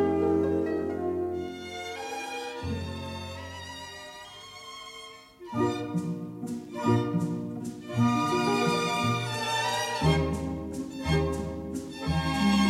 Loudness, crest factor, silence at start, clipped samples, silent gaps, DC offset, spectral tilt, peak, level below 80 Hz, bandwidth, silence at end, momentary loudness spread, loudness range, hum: -29 LUFS; 18 dB; 0 s; under 0.1%; none; under 0.1%; -5.5 dB/octave; -12 dBFS; -46 dBFS; 16 kHz; 0 s; 16 LU; 10 LU; none